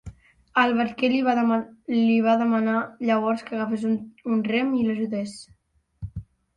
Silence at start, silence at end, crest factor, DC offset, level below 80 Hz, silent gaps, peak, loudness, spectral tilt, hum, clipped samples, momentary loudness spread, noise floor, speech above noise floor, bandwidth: 0.05 s; 0.35 s; 18 dB; under 0.1%; -52 dBFS; none; -6 dBFS; -23 LUFS; -6.5 dB/octave; none; under 0.1%; 16 LU; -45 dBFS; 22 dB; 10.5 kHz